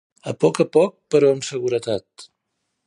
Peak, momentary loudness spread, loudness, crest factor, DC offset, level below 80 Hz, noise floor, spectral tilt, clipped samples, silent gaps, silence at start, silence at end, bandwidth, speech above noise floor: -4 dBFS; 10 LU; -20 LUFS; 18 dB; under 0.1%; -64 dBFS; -76 dBFS; -5.5 dB/octave; under 0.1%; none; 0.25 s; 0.65 s; 11 kHz; 56 dB